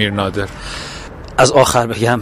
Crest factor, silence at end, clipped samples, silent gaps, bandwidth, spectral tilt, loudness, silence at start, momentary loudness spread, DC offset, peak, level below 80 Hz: 16 dB; 0 s; under 0.1%; none; 15.5 kHz; -4 dB/octave; -14 LUFS; 0 s; 16 LU; under 0.1%; 0 dBFS; -36 dBFS